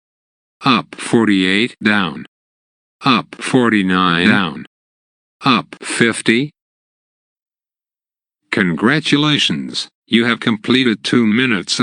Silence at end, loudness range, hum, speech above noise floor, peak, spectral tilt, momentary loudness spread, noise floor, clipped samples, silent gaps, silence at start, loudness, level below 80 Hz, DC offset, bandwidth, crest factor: 0 s; 4 LU; none; over 75 dB; 0 dBFS; -4.5 dB/octave; 8 LU; under -90 dBFS; under 0.1%; 2.28-2.99 s, 4.67-5.40 s, 6.62-7.36 s, 7.42-7.46 s, 9.95-10.02 s; 0.6 s; -15 LUFS; -60 dBFS; under 0.1%; 10.5 kHz; 16 dB